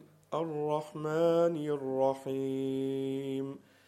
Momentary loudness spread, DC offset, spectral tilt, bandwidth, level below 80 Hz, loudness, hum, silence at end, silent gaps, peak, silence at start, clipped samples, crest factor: 9 LU; under 0.1%; -7.5 dB/octave; 15 kHz; -80 dBFS; -33 LUFS; none; 0.3 s; none; -16 dBFS; 0 s; under 0.1%; 16 dB